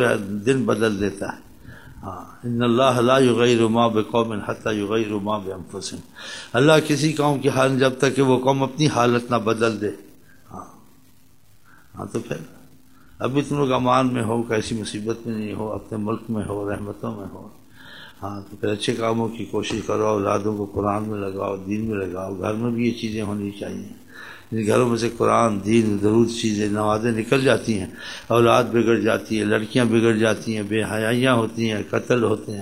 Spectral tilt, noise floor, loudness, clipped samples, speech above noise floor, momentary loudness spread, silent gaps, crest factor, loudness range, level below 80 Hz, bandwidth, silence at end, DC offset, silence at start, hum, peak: -5.5 dB/octave; -56 dBFS; -21 LUFS; under 0.1%; 35 dB; 16 LU; none; 20 dB; 8 LU; -54 dBFS; 16 kHz; 0 s; 0.4%; 0 s; none; -2 dBFS